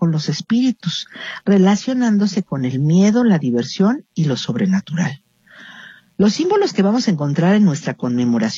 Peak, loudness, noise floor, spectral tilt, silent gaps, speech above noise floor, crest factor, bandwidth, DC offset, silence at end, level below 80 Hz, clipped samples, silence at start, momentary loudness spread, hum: -4 dBFS; -17 LUFS; -43 dBFS; -6.5 dB/octave; none; 27 dB; 14 dB; 7.6 kHz; under 0.1%; 0 s; -62 dBFS; under 0.1%; 0 s; 10 LU; none